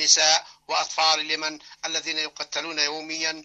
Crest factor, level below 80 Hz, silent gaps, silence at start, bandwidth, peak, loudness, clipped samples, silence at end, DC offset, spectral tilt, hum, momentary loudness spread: 22 dB; -74 dBFS; none; 0 s; 8.6 kHz; -4 dBFS; -23 LUFS; under 0.1%; 0 s; under 0.1%; 1.5 dB/octave; none; 10 LU